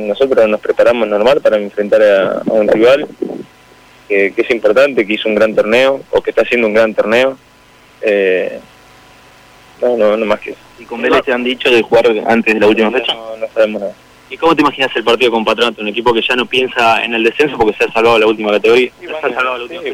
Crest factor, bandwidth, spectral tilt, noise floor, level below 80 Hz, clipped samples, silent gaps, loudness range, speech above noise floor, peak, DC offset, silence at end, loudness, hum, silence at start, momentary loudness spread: 10 dB; 15.5 kHz; -4.5 dB/octave; -44 dBFS; -50 dBFS; under 0.1%; none; 5 LU; 32 dB; -2 dBFS; under 0.1%; 0 s; -12 LUFS; none; 0 s; 9 LU